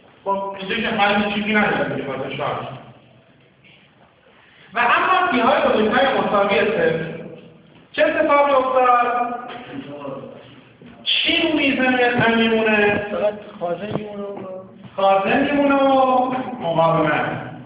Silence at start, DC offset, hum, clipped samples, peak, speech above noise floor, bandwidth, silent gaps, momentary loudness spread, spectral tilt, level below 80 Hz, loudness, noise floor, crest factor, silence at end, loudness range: 0.25 s; under 0.1%; none; under 0.1%; -4 dBFS; 34 dB; 4 kHz; none; 16 LU; -9 dB/octave; -54 dBFS; -18 LUFS; -52 dBFS; 16 dB; 0 s; 4 LU